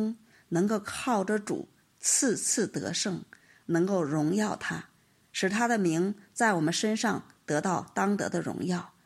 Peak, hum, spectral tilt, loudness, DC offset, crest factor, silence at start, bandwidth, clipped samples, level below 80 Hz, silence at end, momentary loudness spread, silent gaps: -12 dBFS; none; -4 dB/octave; -29 LUFS; under 0.1%; 18 dB; 0 s; 15 kHz; under 0.1%; -72 dBFS; 0.2 s; 10 LU; none